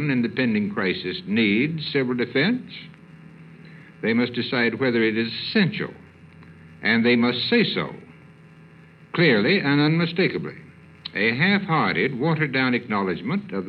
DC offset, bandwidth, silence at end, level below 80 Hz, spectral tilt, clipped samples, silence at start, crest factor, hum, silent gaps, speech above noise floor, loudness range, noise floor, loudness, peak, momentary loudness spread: under 0.1%; 5.6 kHz; 0 s; -66 dBFS; -8.5 dB/octave; under 0.1%; 0 s; 18 dB; none; none; 26 dB; 3 LU; -48 dBFS; -22 LUFS; -6 dBFS; 11 LU